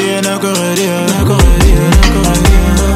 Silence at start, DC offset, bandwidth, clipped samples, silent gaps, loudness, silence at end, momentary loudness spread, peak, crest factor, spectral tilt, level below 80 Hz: 0 s; under 0.1%; 16 kHz; 0.5%; none; -10 LUFS; 0 s; 5 LU; 0 dBFS; 8 dB; -5 dB/octave; -12 dBFS